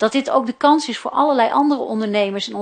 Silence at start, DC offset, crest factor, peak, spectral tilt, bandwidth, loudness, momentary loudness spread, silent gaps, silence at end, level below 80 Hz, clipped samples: 0 s; under 0.1%; 16 dB; -2 dBFS; -4.5 dB/octave; 9.6 kHz; -18 LUFS; 5 LU; none; 0 s; -66 dBFS; under 0.1%